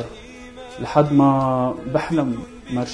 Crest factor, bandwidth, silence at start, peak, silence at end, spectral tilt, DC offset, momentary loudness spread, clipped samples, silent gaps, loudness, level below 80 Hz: 18 dB; 10.5 kHz; 0 s; -2 dBFS; 0 s; -7.5 dB/octave; under 0.1%; 22 LU; under 0.1%; none; -20 LUFS; -46 dBFS